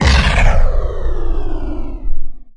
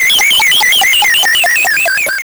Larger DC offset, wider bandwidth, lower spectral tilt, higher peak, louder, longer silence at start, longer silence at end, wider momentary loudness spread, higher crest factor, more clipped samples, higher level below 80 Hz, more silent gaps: neither; second, 10 kHz vs over 20 kHz; first, -5 dB/octave vs 2 dB/octave; first, 0 dBFS vs -6 dBFS; second, -19 LUFS vs -7 LUFS; about the same, 0 s vs 0 s; about the same, 0.05 s vs 0.05 s; first, 16 LU vs 3 LU; first, 12 dB vs 4 dB; neither; first, -14 dBFS vs -48 dBFS; neither